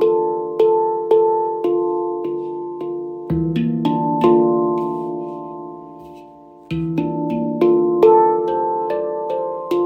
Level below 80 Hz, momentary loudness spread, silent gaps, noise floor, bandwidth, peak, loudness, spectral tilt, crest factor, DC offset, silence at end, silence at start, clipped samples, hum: -50 dBFS; 14 LU; none; -42 dBFS; 5.6 kHz; -2 dBFS; -18 LUFS; -9.5 dB/octave; 18 dB; under 0.1%; 0 s; 0 s; under 0.1%; none